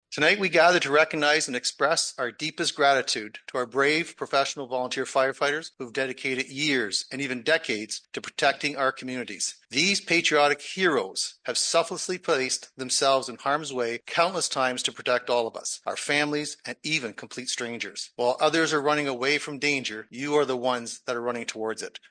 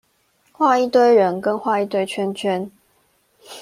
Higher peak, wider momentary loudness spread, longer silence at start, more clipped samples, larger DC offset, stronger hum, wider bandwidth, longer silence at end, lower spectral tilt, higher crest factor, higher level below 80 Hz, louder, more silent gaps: about the same, -6 dBFS vs -4 dBFS; about the same, 10 LU vs 11 LU; second, 0.1 s vs 0.6 s; neither; neither; neither; second, 10.5 kHz vs 14.5 kHz; first, 0.2 s vs 0 s; second, -2 dB/octave vs -5.5 dB/octave; about the same, 20 dB vs 16 dB; second, -74 dBFS vs -68 dBFS; second, -25 LUFS vs -18 LUFS; neither